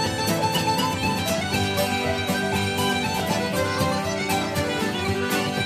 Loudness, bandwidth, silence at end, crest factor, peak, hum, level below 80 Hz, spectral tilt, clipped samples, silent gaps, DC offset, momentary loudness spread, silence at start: -23 LUFS; 15.5 kHz; 0 s; 14 dB; -10 dBFS; none; -48 dBFS; -4 dB/octave; under 0.1%; none; under 0.1%; 2 LU; 0 s